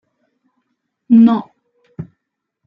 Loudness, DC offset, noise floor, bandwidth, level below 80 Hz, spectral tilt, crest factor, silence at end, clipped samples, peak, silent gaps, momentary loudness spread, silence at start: -12 LUFS; under 0.1%; -77 dBFS; 3.9 kHz; -64 dBFS; -10 dB/octave; 16 dB; 0.65 s; under 0.1%; -2 dBFS; none; 24 LU; 1.1 s